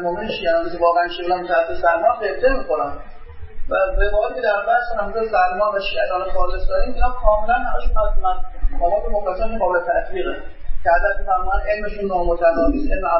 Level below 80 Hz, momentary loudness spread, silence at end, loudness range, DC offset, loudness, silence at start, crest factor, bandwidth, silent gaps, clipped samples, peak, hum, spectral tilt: -26 dBFS; 7 LU; 0 s; 2 LU; under 0.1%; -20 LUFS; 0 s; 16 dB; 5.8 kHz; none; under 0.1%; -2 dBFS; none; -10 dB/octave